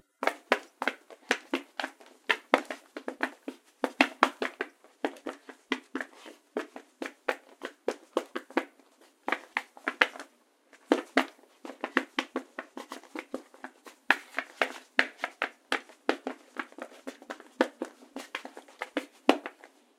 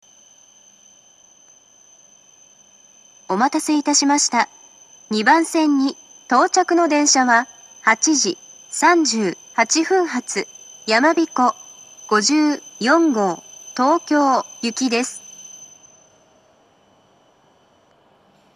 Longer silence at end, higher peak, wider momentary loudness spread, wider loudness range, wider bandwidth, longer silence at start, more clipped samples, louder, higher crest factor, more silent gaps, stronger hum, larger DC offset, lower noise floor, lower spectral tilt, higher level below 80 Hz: second, 0.3 s vs 2.9 s; about the same, 0 dBFS vs 0 dBFS; about the same, 18 LU vs 17 LU; about the same, 6 LU vs 7 LU; first, 16 kHz vs 13.5 kHz; second, 0.2 s vs 3.3 s; neither; second, -32 LUFS vs -18 LUFS; first, 34 dB vs 20 dB; neither; neither; neither; first, -62 dBFS vs -56 dBFS; about the same, -1.5 dB/octave vs -2 dB/octave; about the same, -82 dBFS vs -80 dBFS